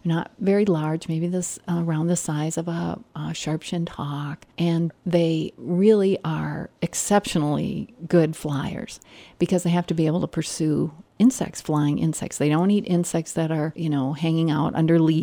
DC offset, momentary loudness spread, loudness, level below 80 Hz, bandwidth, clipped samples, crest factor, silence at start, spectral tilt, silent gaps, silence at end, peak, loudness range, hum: under 0.1%; 9 LU; -23 LUFS; -56 dBFS; 19 kHz; under 0.1%; 16 dB; 0.05 s; -6 dB/octave; none; 0 s; -6 dBFS; 4 LU; none